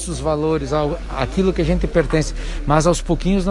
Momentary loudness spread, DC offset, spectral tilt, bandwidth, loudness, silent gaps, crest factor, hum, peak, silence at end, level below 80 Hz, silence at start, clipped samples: 7 LU; under 0.1%; -6 dB/octave; 11.5 kHz; -19 LUFS; none; 16 dB; none; -2 dBFS; 0 s; -26 dBFS; 0 s; under 0.1%